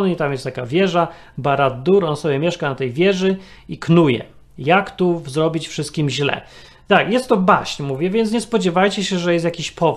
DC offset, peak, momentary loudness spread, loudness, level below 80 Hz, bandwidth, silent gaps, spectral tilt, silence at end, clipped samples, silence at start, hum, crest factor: under 0.1%; 0 dBFS; 9 LU; -18 LUFS; -50 dBFS; 12.5 kHz; none; -6 dB/octave; 0 s; under 0.1%; 0 s; none; 18 dB